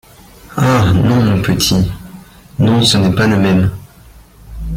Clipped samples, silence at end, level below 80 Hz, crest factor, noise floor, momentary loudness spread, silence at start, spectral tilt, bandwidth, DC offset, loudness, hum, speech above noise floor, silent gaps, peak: under 0.1%; 0 s; -32 dBFS; 14 dB; -40 dBFS; 18 LU; 0.5 s; -5.5 dB/octave; 16.5 kHz; under 0.1%; -12 LUFS; none; 29 dB; none; 0 dBFS